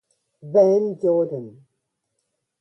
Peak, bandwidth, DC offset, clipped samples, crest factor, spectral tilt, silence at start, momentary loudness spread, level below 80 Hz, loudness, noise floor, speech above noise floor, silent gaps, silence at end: -6 dBFS; 6.2 kHz; under 0.1%; under 0.1%; 18 dB; -9 dB/octave; 0.45 s; 10 LU; -74 dBFS; -20 LUFS; -77 dBFS; 58 dB; none; 1.1 s